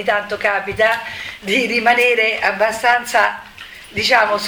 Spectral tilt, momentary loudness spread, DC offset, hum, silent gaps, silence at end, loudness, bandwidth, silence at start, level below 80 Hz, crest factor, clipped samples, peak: -2.5 dB/octave; 14 LU; under 0.1%; none; none; 0 s; -15 LUFS; over 20 kHz; 0 s; -52 dBFS; 16 dB; under 0.1%; 0 dBFS